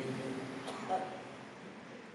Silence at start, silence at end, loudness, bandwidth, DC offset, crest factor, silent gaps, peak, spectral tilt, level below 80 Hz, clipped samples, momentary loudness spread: 0 s; 0 s; -42 LUFS; 11.5 kHz; under 0.1%; 18 dB; none; -24 dBFS; -5.5 dB/octave; -80 dBFS; under 0.1%; 12 LU